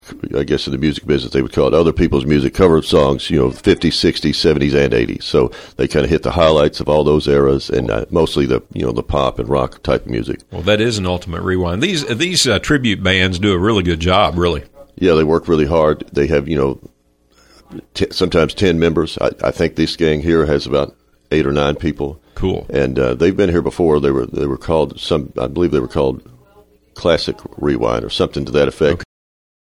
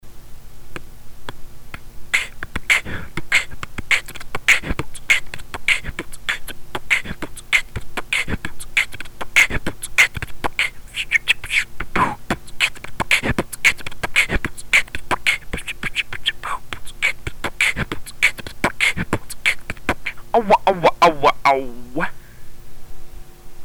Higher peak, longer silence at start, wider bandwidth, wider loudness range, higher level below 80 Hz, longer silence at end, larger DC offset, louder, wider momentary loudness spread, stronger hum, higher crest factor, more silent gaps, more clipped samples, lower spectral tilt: first, 0 dBFS vs -4 dBFS; about the same, 0.05 s vs 0.05 s; second, 15 kHz vs over 20 kHz; about the same, 4 LU vs 4 LU; about the same, -32 dBFS vs -36 dBFS; first, 0.75 s vs 0 s; neither; first, -16 LUFS vs -19 LUFS; second, 8 LU vs 15 LU; neither; about the same, 16 dB vs 16 dB; neither; neither; first, -5.5 dB/octave vs -2.5 dB/octave